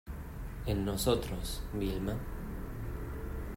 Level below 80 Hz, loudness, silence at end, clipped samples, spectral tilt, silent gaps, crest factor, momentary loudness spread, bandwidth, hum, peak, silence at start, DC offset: -42 dBFS; -37 LUFS; 0 s; under 0.1%; -5.5 dB/octave; none; 20 dB; 11 LU; 16 kHz; none; -16 dBFS; 0.05 s; under 0.1%